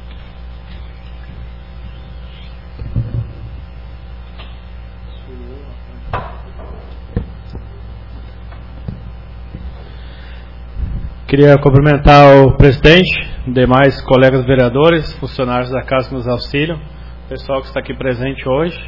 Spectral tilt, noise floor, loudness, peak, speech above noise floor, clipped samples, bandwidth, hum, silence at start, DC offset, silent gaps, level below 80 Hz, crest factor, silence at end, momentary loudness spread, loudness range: -8 dB/octave; -31 dBFS; -12 LUFS; 0 dBFS; 21 dB; 1%; 6 kHz; 60 Hz at -30 dBFS; 0 s; 1%; none; -26 dBFS; 14 dB; 0 s; 26 LU; 22 LU